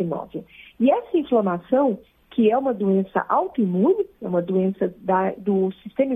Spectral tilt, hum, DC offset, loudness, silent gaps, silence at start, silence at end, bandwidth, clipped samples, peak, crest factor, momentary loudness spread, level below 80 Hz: -10.5 dB/octave; none; under 0.1%; -22 LUFS; none; 0 s; 0 s; 3.8 kHz; under 0.1%; -6 dBFS; 16 dB; 7 LU; -62 dBFS